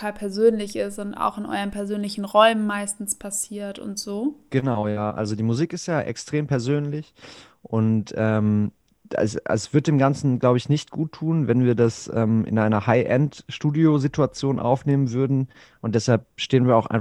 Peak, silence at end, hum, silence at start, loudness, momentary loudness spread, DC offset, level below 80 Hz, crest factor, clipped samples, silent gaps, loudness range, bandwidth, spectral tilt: -2 dBFS; 0 s; none; 0 s; -23 LUFS; 9 LU; under 0.1%; -56 dBFS; 20 dB; under 0.1%; none; 4 LU; 14.5 kHz; -6 dB/octave